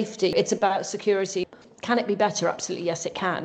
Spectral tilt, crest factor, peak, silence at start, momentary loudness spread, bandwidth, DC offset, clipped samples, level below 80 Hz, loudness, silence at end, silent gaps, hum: -3.5 dB/octave; 18 dB; -8 dBFS; 0 s; 6 LU; 9 kHz; under 0.1%; under 0.1%; -66 dBFS; -25 LUFS; 0 s; none; none